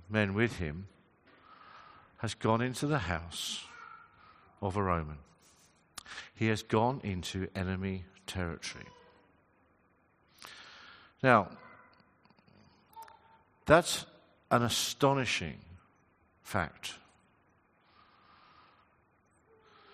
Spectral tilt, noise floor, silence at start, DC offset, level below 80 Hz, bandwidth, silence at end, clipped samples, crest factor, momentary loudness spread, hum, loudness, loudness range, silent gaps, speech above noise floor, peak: -4.5 dB/octave; -69 dBFS; 0.1 s; under 0.1%; -60 dBFS; 14 kHz; 2.95 s; under 0.1%; 30 dB; 26 LU; none; -32 LUFS; 13 LU; none; 38 dB; -6 dBFS